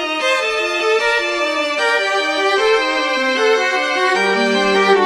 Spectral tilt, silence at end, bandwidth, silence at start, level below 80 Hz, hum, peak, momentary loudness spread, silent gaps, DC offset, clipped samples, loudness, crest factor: -2.5 dB/octave; 0 s; 15 kHz; 0 s; -54 dBFS; none; -2 dBFS; 3 LU; none; under 0.1%; under 0.1%; -15 LUFS; 14 dB